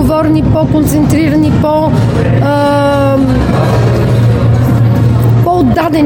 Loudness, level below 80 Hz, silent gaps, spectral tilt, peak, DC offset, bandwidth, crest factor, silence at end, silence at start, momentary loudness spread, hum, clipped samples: -9 LUFS; -24 dBFS; none; -8 dB/octave; 0 dBFS; under 0.1%; 17 kHz; 8 dB; 0 s; 0 s; 1 LU; none; under 0.1%